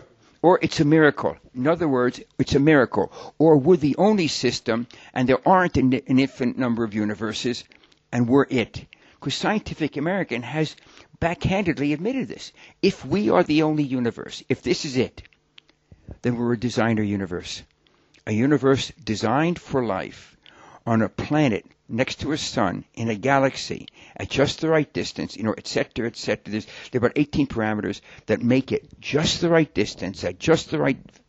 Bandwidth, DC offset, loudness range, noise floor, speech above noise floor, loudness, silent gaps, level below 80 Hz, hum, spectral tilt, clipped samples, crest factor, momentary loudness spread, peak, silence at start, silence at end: 8.2 kHz; under 0.1%; 6 LU; -59 dBFS; 37 dB; -23 LUFS; none; -50 dBFS; none; -6 dB/octave; under 0.1%; 20 dB; 11 LU; -2 dBFS; 0.45 s; 0.3 s